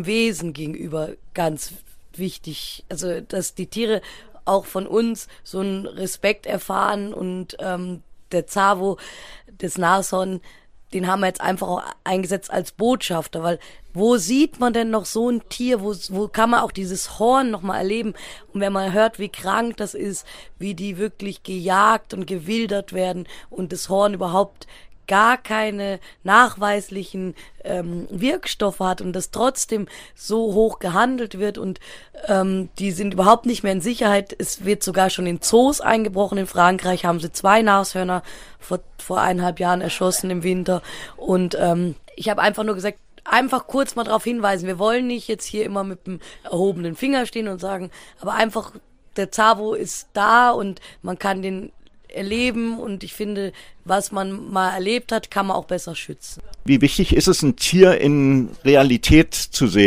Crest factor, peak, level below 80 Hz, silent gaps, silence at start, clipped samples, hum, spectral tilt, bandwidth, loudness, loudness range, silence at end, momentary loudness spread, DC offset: 20 dB; 0 dBFS; -40 dBFS; none; 0 s; under 0.1%; none; -4.5 dB/octave; 16 kHz; -21 LUFS; 6 LU; 0 s; 15 LU; under 0.1%